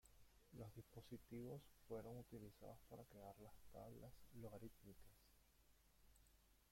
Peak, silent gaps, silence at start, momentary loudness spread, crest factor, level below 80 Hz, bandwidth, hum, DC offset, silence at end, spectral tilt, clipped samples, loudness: -42 dBFS; none; 0.05 s; 8 LU; 18 dB; -74 dBFS; 16.5 kHz; none; under 0.1%; 0 s; -6.5 dB/octave; under 0.1%; -61 LUFS